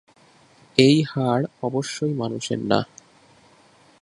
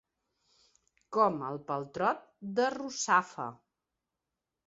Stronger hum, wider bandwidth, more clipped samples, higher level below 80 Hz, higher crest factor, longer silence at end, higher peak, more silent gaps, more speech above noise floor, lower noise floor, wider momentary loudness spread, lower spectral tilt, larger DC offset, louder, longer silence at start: neither; first, 11.5 kHz vs 7.6 kHz; neither; first, -60 dBFS vs -76 dBFS; about the same, 24 dB vs 22 dB; about the same, 1.2 s vs 1.1 s; first, 0 dBFS vs -12 dBFS; neither; second, 34 dB vs 57 dB; second, -55 dBFS vs -88 dBFS; about the same, 10 LU vs 12 LU; first, -5.5 dB/octave vs -3 dB/octave; neither; first, -22 LUFS vs -32 LUFS; second, 0.75 s vs 1.1 s